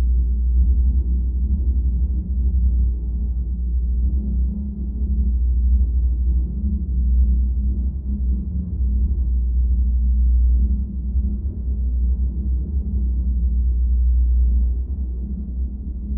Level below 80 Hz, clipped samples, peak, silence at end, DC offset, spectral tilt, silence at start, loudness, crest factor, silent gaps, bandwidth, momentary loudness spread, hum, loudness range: -18 dBFS; under 0.1%; -8 dBFS; 0 s; under 0.1%; -18 dB/octave; 0 s; -22 LUFS; 10 dB; none; 0.6 kHz; 7 LU; none; 2 LU